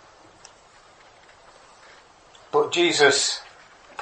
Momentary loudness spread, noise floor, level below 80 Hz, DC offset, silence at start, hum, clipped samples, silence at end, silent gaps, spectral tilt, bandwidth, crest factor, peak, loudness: 14 LU; -52 dBFS; -68 dBFS; under 0.1%; 2.5 s; none; under 0.1%; 0 s; none; -1.5 dB/octave; 8.8 kHz; 22 dB; -4 dBFS; -20 LUFS